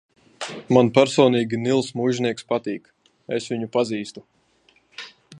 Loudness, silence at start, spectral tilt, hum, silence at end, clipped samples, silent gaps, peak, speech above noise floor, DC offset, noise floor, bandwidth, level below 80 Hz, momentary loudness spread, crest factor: -21 LUFS; 0.4 s; -5.5 dB/octave; none; 0 s; under 0.1%; none; -2 dBFS; 40 dB; under 0.1%; -61 dBFS; 10.5 kHz; -64 dBFS; 19 LU; 22 dB